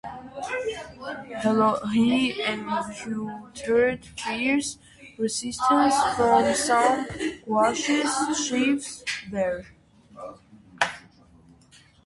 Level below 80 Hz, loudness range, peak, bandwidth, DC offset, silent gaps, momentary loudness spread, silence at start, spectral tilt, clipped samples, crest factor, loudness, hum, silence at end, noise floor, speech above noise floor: -56 dBFS; 6 LU; -6 dBFS; 11.5 kHz; under 0.1%; none; 15 LU; 0.05 s; -3.5 dB/octave; under 0.1%; 20 dB; -24 LUFS; none; 1.05 s; -55 dBFS; 31 dB